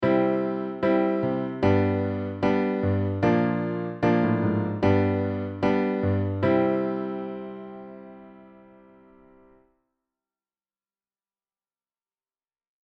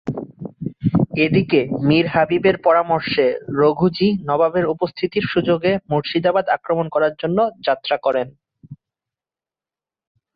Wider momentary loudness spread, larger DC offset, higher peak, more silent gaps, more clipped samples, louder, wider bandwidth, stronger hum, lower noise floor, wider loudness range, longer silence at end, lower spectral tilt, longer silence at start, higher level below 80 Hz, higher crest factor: first, 13 LU vs 6 LU; neither; second, -8 dBFS vs -4 dBFS; neither; neither; second, -25 LUFS vs -18 LUFS; first, 6.2 kHz vs 5 kHz; neither; about the same, under -90 dBFS vs under -90 dBFS; first, 11 LU vs 5 LU; first, 4.35 s vs 1.6 s; about the same, -9.5 dB/octave vs -9.5 dB/octave; about the same, 0 s vs 0.05 s; second, -58 dBFS vs -52 dBFS; about the same, 18 dB vs 16 dB